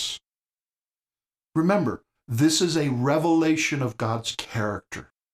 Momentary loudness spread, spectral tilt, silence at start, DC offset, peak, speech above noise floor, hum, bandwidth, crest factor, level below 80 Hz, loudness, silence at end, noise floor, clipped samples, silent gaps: 14 LU; -5 dB/octave; 0 s; under 0.1%; -8 dBFS; over 67 dB; none; 15.5 kHz; 16 dB; -60 dBFS; -24 LUFS; 0.3 s; under -90 dBFS; under 0.1%; 0.39-0.43 s